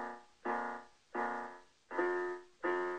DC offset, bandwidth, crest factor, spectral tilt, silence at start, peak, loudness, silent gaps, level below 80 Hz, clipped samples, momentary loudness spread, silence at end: under 0.1%; 9 kHz; 18 dB; -5 dB/octave; 0 s; -22 dBFS; -40 LUFS; none; -80 dBFS; under 0.1%; 12 LU; 0 s